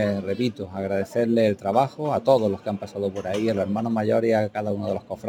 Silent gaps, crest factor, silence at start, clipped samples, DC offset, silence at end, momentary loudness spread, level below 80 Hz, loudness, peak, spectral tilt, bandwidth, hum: none; 18 dB; 0 s; under 0.1%; under 0.1%; 0 s; 8 LU; -62 dBFS; -24 LUFS; -4 dBFS; -7 dB/octave; 16.5 kHz; none